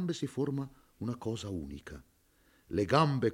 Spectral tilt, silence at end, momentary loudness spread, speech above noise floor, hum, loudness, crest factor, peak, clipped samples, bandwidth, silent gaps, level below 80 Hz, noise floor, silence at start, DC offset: -6.5 dB/octave; 0 s; 19 LU; 35 dB; none; -34 LUFS; 22 dB; -12 dBFS; under 0.1%; 16 kHz; none; -60 dBFS; -68 dBFS; 0 s; under 0.1%